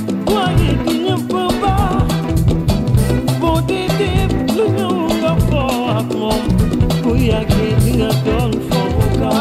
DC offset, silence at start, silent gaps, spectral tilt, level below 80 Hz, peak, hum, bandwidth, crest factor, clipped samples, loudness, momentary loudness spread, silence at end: under 0.1%; 0 s; none; -6.5 dB/octave; -24 dBFS; -2 dBFS; none; 15.5 kHz; 12 dB; under 0.1%; -16 LUFS; 3 LU; 0 s